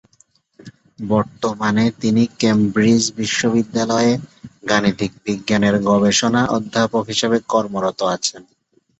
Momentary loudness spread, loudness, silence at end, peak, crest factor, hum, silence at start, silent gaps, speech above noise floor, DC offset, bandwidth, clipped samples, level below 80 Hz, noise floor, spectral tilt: 8 LU; -18 LUFS; 0.6 s; -2 dBFS; 16 dB; none; 0.65 s; none; 40 dB; under 0.1%; 8.2 kHz; under 0.1%; -52 dBFS; -57 dBFS; -4.5 dB/octave